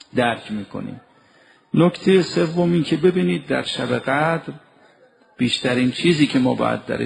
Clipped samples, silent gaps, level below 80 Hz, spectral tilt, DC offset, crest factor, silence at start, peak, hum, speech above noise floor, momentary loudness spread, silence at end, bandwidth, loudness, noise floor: under 0.1%; none; -56 dBFS; -6 dB/octave; under 0.1%; 16 dB; 0.15 s; -4 dBFS; none; 35 dB; 11 LU; 0 s; 11 kHz; -19 LUFS; -54 dBFS